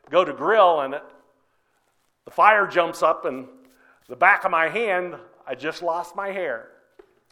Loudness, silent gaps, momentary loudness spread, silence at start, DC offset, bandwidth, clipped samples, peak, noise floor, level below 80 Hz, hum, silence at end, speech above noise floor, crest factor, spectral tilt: -21 LUFS; none; 18 LU; 0.1 s; under 0.1%; 15 kHz; under 0.1%; -2 dBFS; -68 dBFS; -70 dBFS; none; 0.7 s; 47 dB; 22 dB; -4 dB/octave